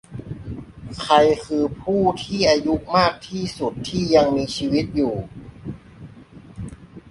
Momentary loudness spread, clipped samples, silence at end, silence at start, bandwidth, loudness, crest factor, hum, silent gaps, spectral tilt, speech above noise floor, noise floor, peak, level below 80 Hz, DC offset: 20 LU; under 0.1%; 0 s; 0.1 s; 11.5 kHz; -20 LUFS; 20 dB; none; none; -5.5 dB/octave; 24 dB; -43 dBFS; -2 dBFS; -44 dBFS; under 0.1%